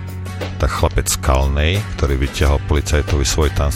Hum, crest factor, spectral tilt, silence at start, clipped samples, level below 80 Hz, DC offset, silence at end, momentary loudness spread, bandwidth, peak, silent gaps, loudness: none; 14 dB; -4.5 dB/octave; 0 s; under 0.1%; -20 dBFS; under 0.1%; 0 s; 5 LU; 16 kHz; -2 dBFS; none; -18 LUFS